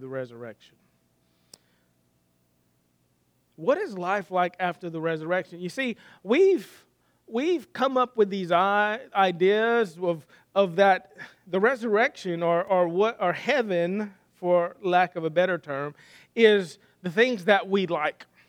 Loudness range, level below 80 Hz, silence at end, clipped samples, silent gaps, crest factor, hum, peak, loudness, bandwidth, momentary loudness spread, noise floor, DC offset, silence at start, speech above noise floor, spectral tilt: 7 LU; -80 dBFS; 0.25 s; under 0.1%; none; 22 dB; 60 Hz at -60 dBFS; -4 dBFS; -25 LUFS; 13.5 kHz; 13 LU; -69 dBFS; under 0.1%; 0 s; 44 dB; -6 dB/octave